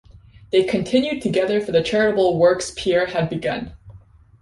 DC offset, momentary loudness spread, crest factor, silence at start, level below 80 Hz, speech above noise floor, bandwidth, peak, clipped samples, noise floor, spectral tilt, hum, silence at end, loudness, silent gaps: under 0.1%; 7 LU; 16 dB; 0.15 s; -48 dBFS; 28 dB; 11.5 kHz; -4 dBFS; under 0.1%; -47 dBFS; -5 dB/octave; none; 0.45 s; -20 LUFS; none